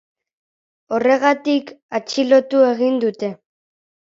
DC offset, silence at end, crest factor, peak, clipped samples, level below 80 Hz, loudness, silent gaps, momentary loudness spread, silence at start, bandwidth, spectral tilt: under 0.1%; 0.8 s; 18 dB; -2 dBFS; under 0.1%; -72 dBFS; -18 LUFS; 1.83-1.89 s; 12 LU; 0.9 s; 7.6 kHz; -4.5 dB/octave